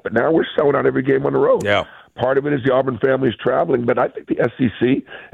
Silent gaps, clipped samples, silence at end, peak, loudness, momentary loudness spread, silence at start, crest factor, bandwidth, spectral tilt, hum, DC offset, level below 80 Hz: none; under 0.1%; 0.1 s; -4 dBFS; -18 LUFS; 5 LU; 0.05 s; 14 dB; 9.2 kHz; -7.5 dB/octave; none; under 0.1%; -54 dBFS